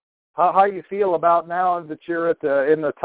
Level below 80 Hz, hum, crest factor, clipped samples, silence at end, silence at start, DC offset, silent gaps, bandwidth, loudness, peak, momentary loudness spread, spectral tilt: -66 dBFS; none; 16 dB; under 0.1%; 0 s; 0.35 s; under 0.1%; none; 4 kHz; -20 LUFS; -4 dBFS; 8 LU; -9.5 dB/octave